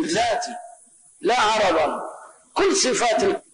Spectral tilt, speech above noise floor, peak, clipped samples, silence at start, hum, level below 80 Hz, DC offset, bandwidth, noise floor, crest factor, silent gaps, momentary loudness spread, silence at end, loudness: -2 dB/octave; 30 dB; -10 dBFS; under 0.1%; 0 s; none; -54 dBFS; under 0.1%; 11 kHz; -51 dBFS; 12 dB; none; 14 LU; 0.15 s; -21 LUFS